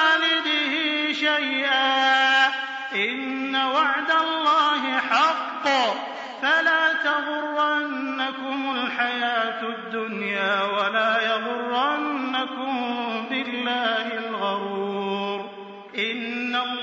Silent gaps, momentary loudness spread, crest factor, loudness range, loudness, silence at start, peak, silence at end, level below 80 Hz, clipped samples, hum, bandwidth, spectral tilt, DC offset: none; 9 LU; 16 dB; 5 LU; -23 LUFS; 0 s; -8 dBFS; 0 s; -82 dBFS; under 0.1%; none; 7.6 kHz; 0.5 dB/octave; under 0.1%